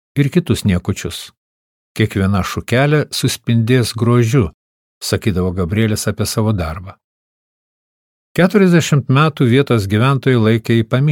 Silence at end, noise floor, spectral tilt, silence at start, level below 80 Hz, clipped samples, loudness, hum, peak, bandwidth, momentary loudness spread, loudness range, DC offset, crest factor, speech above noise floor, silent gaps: 0 s; under -90 dBFS; -6 dB/octave; 0.15 s; -40 dBFS; under 0.1%; -15 LUFS; none; 0 dBFS; 17 kHz; 10 LU; 6 LU; under 0.1%; 16 dB; over 76 dB; 1.37-1.95 s, 4.54-5.01 s, 7.04-8.35 s